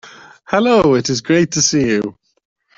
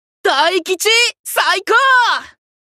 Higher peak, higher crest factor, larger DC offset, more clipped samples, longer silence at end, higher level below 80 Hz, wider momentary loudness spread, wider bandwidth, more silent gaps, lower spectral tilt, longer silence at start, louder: about the same, -2 dBFS vs -2 dBFS; about the same, 14 dB vs 14 dB; neither; neither; first, 0.65 s vs 0.4 s; first, -48 dBFS vs -68 dBFS; about the same, 8 LU vs 6 LU; second, 7.8 kHz vs 14 kHz; second, none vs 1.19-1.24 s; first, -4 dB/octave vs 1.5 dB/octave; second, 0.05 s vs 0.25 s; about the same, -14 LUFS vs -13 LUFS